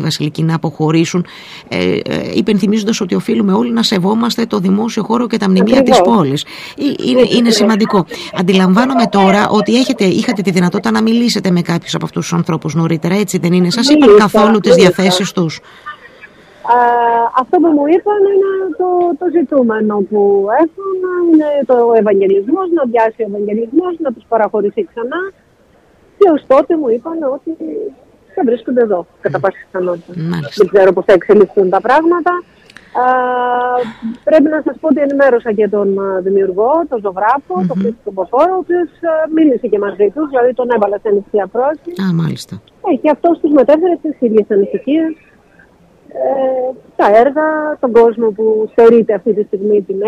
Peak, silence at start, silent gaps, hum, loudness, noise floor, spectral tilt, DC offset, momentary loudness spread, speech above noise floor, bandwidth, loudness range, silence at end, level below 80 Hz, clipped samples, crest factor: 0 dBFS; 0 s; none; none; -12 LUFS; -49 dBFS; -6 dB/octave; under 0.1%; 10 LU; 37 dB; 14.5 kHz; 4 LU; 0 s; -52 dBFS; under 0.1%; 12 dB